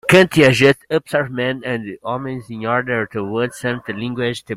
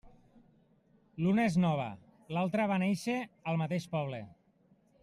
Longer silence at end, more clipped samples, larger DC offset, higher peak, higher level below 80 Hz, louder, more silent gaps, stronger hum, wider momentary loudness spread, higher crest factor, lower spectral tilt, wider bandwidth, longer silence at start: second, 0 s vs 0.7 s; neither; neither; first, 0 dBFS vs -18 dBFS; first, -50 dBFS vs -70 dBFS; first, -18 LUFS vs -33 LUFS; neither; neither; about the same, 13 LU vs 15 LU; about the same, 18 dB vs 16 dB; second, -5.5 dB/octave vs -7 dB/octave; first, 16 kHz vs 12.5 kHz; about the same, 0.05 s vs 0.05 s